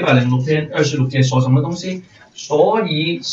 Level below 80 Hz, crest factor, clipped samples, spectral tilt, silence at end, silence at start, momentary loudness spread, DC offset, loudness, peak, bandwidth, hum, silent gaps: -56 dBFS; 16 dB; under 0.1%; -6 dB/octave; 0 s; 0 s; 11 LU; under 0.1%; -17 LUFS; 0 dBFS; 7.6 kHz; none; none